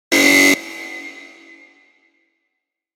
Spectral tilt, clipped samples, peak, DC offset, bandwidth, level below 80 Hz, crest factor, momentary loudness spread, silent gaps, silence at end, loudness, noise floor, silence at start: -1 dB/octave; under 0.1%; 0 dBFS; under 0.1%; 16.5 kHz; -66 dBFS; 20 dB; 22 LU; none; 1.85 s; -12 LUFS; -78 dBFS; 0.1 s